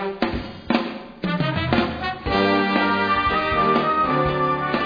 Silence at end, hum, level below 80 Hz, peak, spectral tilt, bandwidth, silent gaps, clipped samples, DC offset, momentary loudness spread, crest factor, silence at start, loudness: 0 s; none; -40 dBFS; -4 dBFS; -7.5 dB/octave; 5.2 kHz; none; under 0.1%; under 0.1%; 8 LU; 18 dB; 0 s; -21 LUFS